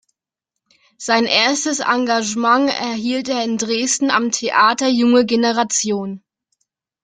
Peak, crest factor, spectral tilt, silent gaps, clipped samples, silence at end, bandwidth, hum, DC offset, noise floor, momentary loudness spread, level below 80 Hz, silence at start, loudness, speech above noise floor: -2 dBFS; 16 dB; -2 dB/octave; none; under 0.1%; 0.85 s; 9.6 kHz; none; under 0.1%; -82 dBFS; 7 LU; -64 dBFS; 1 s; -16 LUFS; 65 dB